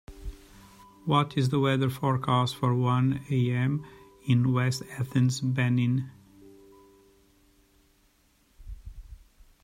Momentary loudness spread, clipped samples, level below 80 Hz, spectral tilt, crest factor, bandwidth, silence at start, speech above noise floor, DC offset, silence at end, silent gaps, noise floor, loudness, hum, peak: 21 LU; under 0.1%; -52 dBFS; -6.5 dB/octave; 20 dB; 14.5 kHz; 0.1 s; 40 dB; under 0.1%; 0.45 s; none; -65 dBFS; -27 LUFS; none; -8 dBFS